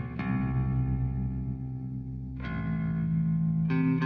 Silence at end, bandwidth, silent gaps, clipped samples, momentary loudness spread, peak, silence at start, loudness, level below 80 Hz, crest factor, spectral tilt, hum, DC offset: 0 s; 4.8 kHz; none; under 0.1%; 9 LU; -16 dBFS; 0 s; -31 LUFS; -40 dBFS; 12 dB; -10.5 dB/octave; none; under 0.1%